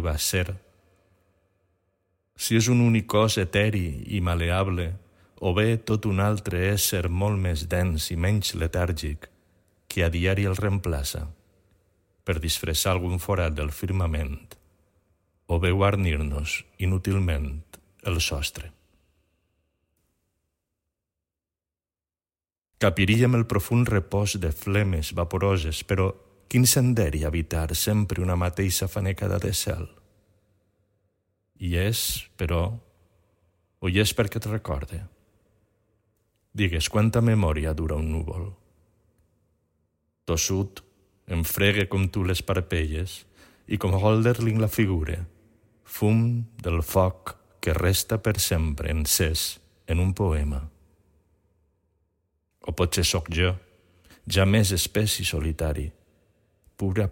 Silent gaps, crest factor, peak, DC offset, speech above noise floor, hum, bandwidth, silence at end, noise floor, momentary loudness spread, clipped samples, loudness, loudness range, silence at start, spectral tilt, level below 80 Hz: none; 20 dB; -6 dBFS; under 0.1%; over 66 dB; none; 16.5 kHz; 0 s; under -90 dBFS; 12 LU; under 0.1%; -25 LUFS; 6 LU; 0 s; -5 dB/octave; -38 dBFS